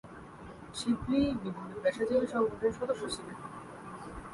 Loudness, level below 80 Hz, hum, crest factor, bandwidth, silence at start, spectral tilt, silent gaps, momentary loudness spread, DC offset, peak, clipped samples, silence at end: -33 LUFS; -56 dBFS; none; 16 dB; 11.5 kHz; 0.05 s; -5.5 dB/octave; none; 17 LU; under 0.1%; -18 dBFS; under 0.1%; 0 s